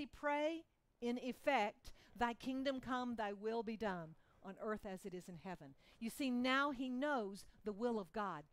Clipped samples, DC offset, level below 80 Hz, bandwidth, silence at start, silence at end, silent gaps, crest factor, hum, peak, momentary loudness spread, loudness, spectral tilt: under 0.1%; under 0.1%; -70 dBFS; 16 kHz; 0 s; 0.1 s; none; 18 dB; none; -26 dBFS; 14 LU; -43 LUFS; -5 dB/octave